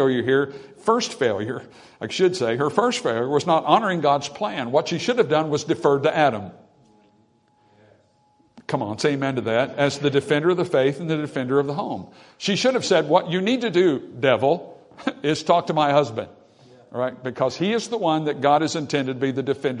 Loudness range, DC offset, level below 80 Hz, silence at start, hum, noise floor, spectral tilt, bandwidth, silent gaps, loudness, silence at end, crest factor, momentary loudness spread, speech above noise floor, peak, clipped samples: 4 LU; under 0.1%; -66 dBFS; 0 s; none; -61 dBFS; -5 dB/octave; 11 kHz; none; -22 LUFS; 0 s; 22 dB; 10 LU; 39 dB; 0 dBFS; under 0.1%